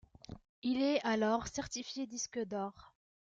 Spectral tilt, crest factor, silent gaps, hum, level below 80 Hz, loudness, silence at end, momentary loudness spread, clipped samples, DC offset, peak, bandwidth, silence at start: -3.5 dB/octave; 16 dB; 0.49-0.62 s; none; -64 dBFS; -36 LUFS; 0.5 s; 16 LU; under 0.1%; under 0.1%; -20 dBFS; 9 kHz; 0.3 s